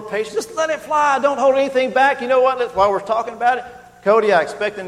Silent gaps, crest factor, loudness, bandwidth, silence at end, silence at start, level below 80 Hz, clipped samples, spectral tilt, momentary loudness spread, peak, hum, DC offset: none; 16 dB; -17 LUFS; 13 kHz; 0 s; 0 s; -54 dBFS; under 0.1%; -3.5 dB/octave; 8 LU; -2 dBFS; 60 Hz at -55 dBFS; under 0.1%